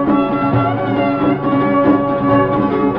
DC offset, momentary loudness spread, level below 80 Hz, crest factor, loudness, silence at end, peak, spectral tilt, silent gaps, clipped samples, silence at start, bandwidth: under 0.1%; 3 LU; -40 dBFS; 12 dB; -15 LUFS; 0 s; -2 dBFS; -10.5 dB/octave; none; under 0.1%; 0 s; 5.2 kHz